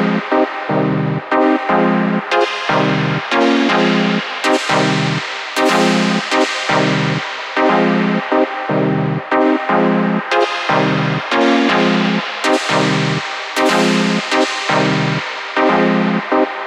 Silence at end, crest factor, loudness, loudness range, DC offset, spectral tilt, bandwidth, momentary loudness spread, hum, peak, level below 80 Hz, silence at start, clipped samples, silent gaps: 0 s; 14 dB; -15 LUFS; 1 LU; under 0.1%; -5 dB/octave; 15.5 kHz; 4 LU; none; -2 dBFS; -60 dBFS; 0 s; under 0.1%; none